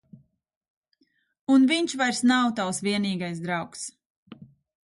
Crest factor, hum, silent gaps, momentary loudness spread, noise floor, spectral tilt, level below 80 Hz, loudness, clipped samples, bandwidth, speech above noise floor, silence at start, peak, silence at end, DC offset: 18 dB; none; 0.56-0.61 s, 0.70-0.82 s, 1.41-1.47 s, 4.06-4.26 s; 16 LU; -70 dBFS; -4 dB/octave; -70 dBFS; -24 LUFS; under 0.1%; 11.5 kHz; 46 dB; 0.15 s; -10 dBFS; 0.5 s; under 0.1%